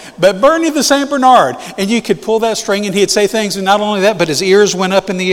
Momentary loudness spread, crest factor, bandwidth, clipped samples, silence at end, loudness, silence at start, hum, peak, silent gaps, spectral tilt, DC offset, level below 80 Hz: 6 LU; 12 dB; 17.5 kHz; 0.2%; 0 s; -12 LUFS; 0 s; none; 0 dBFS; none; -3.5 dB/octave; under 0.1%; -48 dBFS